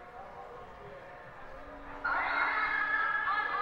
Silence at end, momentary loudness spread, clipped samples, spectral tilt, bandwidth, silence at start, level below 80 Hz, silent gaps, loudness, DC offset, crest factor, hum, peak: 0 s; 19 LU; under 0.1%; -4.5 dB/octave; 8.6 kHz; 0 s; -58 dBFS; none; -30 LUFS; under 0.1%; 16 dB; none; -18 dBFS